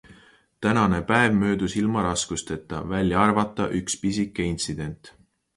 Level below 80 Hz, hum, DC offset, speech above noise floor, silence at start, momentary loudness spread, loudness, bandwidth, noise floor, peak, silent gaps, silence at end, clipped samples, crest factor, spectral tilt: -46 dBFS; none; under 0.1%; 32 dB; 0.1 s; 11 LU; -24 LUFS; 11.5 kHz; -55 dBFS; -4 dBFS; none; 0.45 s; under 0.1%; 20 dB; -5 dB/octave